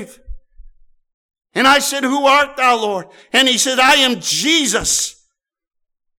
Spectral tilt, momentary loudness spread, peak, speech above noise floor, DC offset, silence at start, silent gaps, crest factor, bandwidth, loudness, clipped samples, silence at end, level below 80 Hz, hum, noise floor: -1 dB/octave; 8 LU; -4 dBFS; 64 dB; under 0.1%; 0 s; 1.14-1.29 s; 14 dB; over 20 kHz; -13 LUFS; under 0.1%; 1.05 s; -44 dBFS; none; -79 dBFS